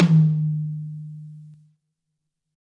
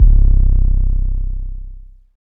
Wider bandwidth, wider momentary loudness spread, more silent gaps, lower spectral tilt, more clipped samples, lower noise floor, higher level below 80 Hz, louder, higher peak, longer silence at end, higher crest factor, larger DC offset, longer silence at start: first, 5.6 kHz vs 0.8 kHz; first, 23 LU vs 19 LU; neither; second, -9.5 dB/octave vs -13 dB/octave; neither; first, -80 dBFS vs -34 dBFS; second, -70 dBFS vs -12 dBFS; second, -22 LUFS vs -18 LUFS; second, -6 dBFS vs 0 dBFS; first, 1.15 s vs 0.15 s; first, 18 dB vs 12 dB; neither; about the same, 0 s vs 0 s